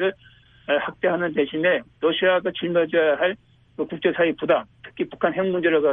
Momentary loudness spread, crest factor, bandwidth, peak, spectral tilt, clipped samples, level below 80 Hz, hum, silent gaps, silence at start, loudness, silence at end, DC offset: 11 LU; 16 dB; 3.9 kHz; -6 dBFS; -8.5 dB/octave; under 0.1%; -62 dBFS; none; none; 0 s; -22 LUFS; 0 s; under 0.1%